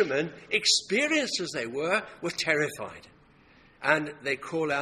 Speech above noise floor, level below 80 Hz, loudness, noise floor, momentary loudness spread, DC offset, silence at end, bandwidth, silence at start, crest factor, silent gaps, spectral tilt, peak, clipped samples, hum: 29 dB; -68 dBFS; -27 LUFS; -58 dBFS; 9 LU; under 0.1%; 0 s; 15 kHz; 0 s; 22 dB; none; -2.5 dB/octave; -8 dBFS; under 0.1%; none